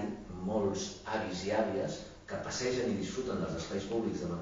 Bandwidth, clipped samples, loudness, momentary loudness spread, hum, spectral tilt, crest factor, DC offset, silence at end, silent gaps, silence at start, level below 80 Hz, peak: 7.4 kHz; under 0.1%; -36 LUFS; 8 LU; none; -5 dB/octave; 16 dB; under 0.1%; 0 s; none; 0 s; -58 dBFS; -18 dBFS